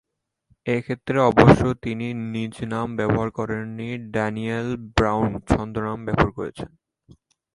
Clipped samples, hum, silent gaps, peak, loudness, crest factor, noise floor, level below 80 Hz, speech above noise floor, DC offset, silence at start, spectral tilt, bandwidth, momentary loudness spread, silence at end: under 0.1%; none; none; 0 dBFS; -22 LUFS; 22 dB; -65 dBFS; -40 dBFS; 43 dB; under 0.1%; 0.65 s; -7.5 dB/octave; 11.5 kHz; 14 LU; 0.9 s